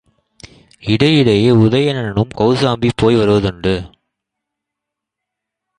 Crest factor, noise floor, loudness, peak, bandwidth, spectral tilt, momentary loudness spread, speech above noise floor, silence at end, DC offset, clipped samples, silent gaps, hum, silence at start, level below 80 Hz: 16 dB; -81 dBFS; -14 LUFS; 0 dBFS; 10.5 kHz; -7 dB/octave; 8 LU; 68 dB; 1.9 s; under 0.1%; under 0.1%; none; none; 0.85 s; -40 dBFS